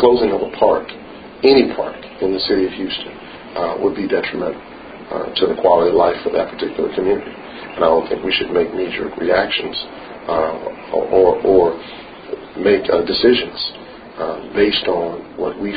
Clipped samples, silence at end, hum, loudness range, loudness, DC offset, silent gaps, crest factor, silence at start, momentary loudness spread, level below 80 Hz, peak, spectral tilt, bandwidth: under 0.1%; 0 s; none; 3 LU; -17 LUFS; under 0.1%; none; 18 dB; 0 s; 17 LU; -46 dBFS; 0 dBFS; -8.5 dB/octave; 5 kHz